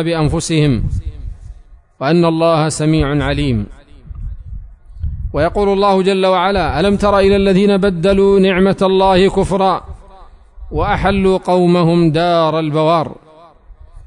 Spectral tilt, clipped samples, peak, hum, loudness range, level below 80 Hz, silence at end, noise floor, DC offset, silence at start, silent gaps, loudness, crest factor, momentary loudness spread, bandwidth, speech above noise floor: -6.5 dB/octave; under 0.1%; -2 dBFS; none; 5 LU; -30 dBFS; 0.05 s; -41 dBFS; under 0.1%; 0 s; none; -13 LUFS; 12 dB; 15 LU; 11 kHz; 28 dB